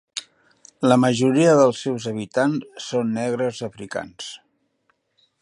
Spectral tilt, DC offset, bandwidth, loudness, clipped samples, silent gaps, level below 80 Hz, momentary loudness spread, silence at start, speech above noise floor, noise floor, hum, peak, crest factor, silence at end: -5.5 dB/octave; under 0.1%; 11.5 kHz; -21 LUFS; under 0.1%; none; -66 dBFS; 18 LU; 0.15 s; 48 dB; -68 dBFS; none; -2 dBFS; 20 dB; 1.05 s